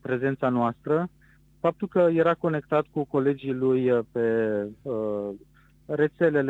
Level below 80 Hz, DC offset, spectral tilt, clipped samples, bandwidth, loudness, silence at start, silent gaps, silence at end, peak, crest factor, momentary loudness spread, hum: -62 dBFS; under 0.1%; -9.5 dB/octave; under 0.1%; 7.6 kHz; -26 LUFS; 0.05 s; none; 0 s; -10 dBFS; 16 dB; 9 LU; none